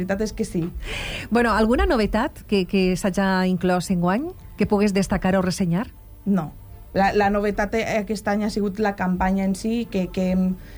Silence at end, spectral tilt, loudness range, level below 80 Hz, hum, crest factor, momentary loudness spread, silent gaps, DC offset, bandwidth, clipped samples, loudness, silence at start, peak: 0 s; -6 dB/octave; 2 LU; -36 dBFS; none; 14 dB; 8 LU; none; under 0.1%; 19.5 kHz; under 0.1%; -22 LUFS; 0 s; -8 dBFS